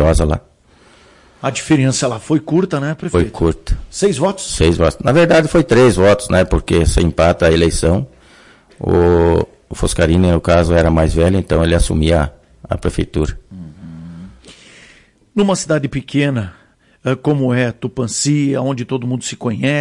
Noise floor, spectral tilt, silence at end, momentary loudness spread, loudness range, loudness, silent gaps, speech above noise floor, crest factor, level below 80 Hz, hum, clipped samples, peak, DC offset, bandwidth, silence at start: -48 dBFS; -6 dB/octave; 0 s; 12 LU; 8 LU; -15 LUFS; none; 34 dB; 12 dB; -28 dBFS; none; under 0.1%; -2 dBFS; under 0.1%; 11.5 kHz; 0 s